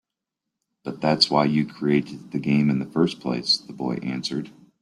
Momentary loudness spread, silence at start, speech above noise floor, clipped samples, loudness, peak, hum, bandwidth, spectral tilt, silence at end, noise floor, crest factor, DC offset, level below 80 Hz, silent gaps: 13 LU; 0.85 s; 62 dB; under 0.1%; -23 LUFS; -4 dBFS; none; 11.5 kHz; -5.5 dB/octave; 0.3 s; -85 dBFS; 20 dB; under 0.1%; -62 dBFS; none